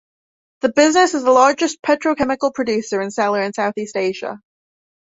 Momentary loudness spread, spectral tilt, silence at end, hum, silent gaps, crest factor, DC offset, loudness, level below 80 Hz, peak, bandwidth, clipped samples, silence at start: 10 LU; -3.5 dB/octave; 0.7 s; none; none; 16 dB; under 0.1%; -17 LUFS; -58 dBFS; -2 dBFS; 8 kHz; under 0.1%; 0.65 s